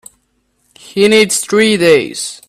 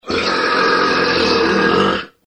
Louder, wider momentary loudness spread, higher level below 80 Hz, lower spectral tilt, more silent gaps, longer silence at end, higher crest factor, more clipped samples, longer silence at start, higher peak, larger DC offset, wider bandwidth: first, -11 LUFS vs -14 LUFS; first, 9 LU vs 3 LU; second, -54 dBFS vs -44 dBFS; second, -3 dB/octave vs -4.5 dB/octave; neither; about the same, 0.15 s vs 0.2 s; about the same, 14 dB vs 14 dB; neither; first, 0.95 s vs 0.05 s; about the same, 0 dBFS vs -2 dBFS; neither; first, 14.5 kHz vs 10.5 kHz